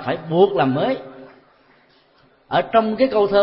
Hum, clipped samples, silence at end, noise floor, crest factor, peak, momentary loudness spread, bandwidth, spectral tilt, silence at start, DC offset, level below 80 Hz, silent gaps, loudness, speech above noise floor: none; under 0.1%; 0 s; -56 dBFS; 18 dB; -2 dBFS; 8 LU; 5.8 kHz; -11 dB/octave; 0 s; under 0.1%; -54 dBFS; none; -19 LUFS; 39 dB